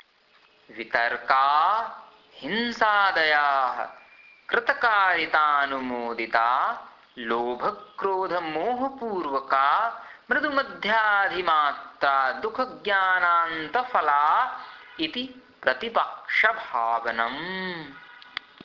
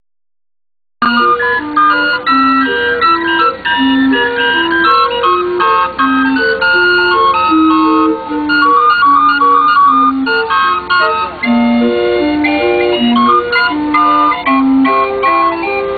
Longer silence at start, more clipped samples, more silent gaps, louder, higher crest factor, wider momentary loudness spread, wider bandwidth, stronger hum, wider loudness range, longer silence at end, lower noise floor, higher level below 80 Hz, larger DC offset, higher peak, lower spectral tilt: second, 0.7 s vs 1 s; neither; neither; second, -24 LUFS vs -10 LUFS; first, 20 dB vs 10 dB; first, 13 LU vs 4 LU; first, 6 kHz vs 4.9 kHz; neither; about the same, 4 LU vs 2 LU; first, 0.35 s vs 0 s; second, -60 dBFS vs under -90 dBFS; second, -66 dBFS vs -44 dBFS; neither; second, -6 dBFS vs 0 dBFS; second, -4.5 dB/octave vs -6 dB/octave